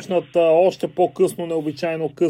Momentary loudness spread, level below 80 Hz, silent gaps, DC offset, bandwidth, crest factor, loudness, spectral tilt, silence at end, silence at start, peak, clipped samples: 9 LU; -66 dBFS; none; under 0.1%; 15.5 kHz; 14 dB; -20 LUFS; -6 dB/octave; 0 s; 0 s; -4 dBFS; under 0.1%